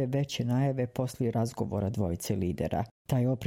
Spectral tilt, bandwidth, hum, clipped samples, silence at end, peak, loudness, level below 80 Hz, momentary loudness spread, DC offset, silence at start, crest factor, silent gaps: -7 dB/octave; 16.5 kHz; none; under 0.1%; 0 s; -14 dBFS; -31 LUFS; -54 dBFS; 4 LU; under 0.1%; 0 s; 16 dB; 2.91-3.05 s